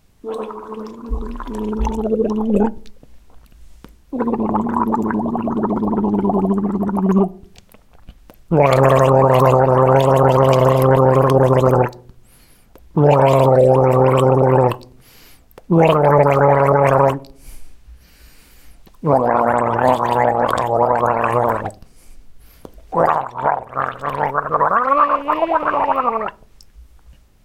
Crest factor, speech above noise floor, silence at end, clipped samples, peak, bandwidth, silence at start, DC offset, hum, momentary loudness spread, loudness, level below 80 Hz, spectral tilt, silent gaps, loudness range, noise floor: 14 dB; 31 dB; 0.6 s; under 0.1%; -2 dBFS; 15.5 kHz; 0.25 s; under 0.1%; none; 12 LU; -15 LUFS; -38 dBFS; -8 dB/octave; none; 8 LU; -48 dBFS